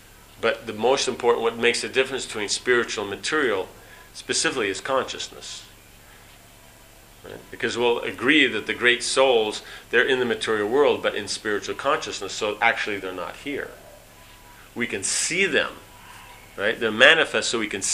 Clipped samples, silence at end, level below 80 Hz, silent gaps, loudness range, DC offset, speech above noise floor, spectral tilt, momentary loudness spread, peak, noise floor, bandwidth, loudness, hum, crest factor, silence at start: under 0.1%; 0 s; -56 dBFS; none; 8 LU; under 0.1%; 26 dB; -2 dB/octave; 17 LU; 0 dBFS; -49 dBFS; 15.5 kHz; -22 LUFS; none; 24 dB; 0.4 s